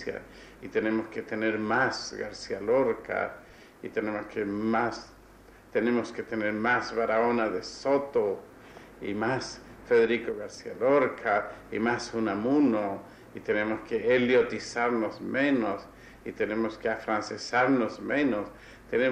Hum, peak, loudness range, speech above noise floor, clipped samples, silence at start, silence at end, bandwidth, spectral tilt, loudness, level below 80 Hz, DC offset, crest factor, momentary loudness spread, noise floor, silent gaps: none; -14 dBFS; 3 LU; 25 dB; under 0.1%; 0 s; 0 s; 10.5 kHz; -5.5 dB/octave; -28 LUFS; -60 dBFS; under 0.1%; 16 dB; 14 LU; -53 dBFS; none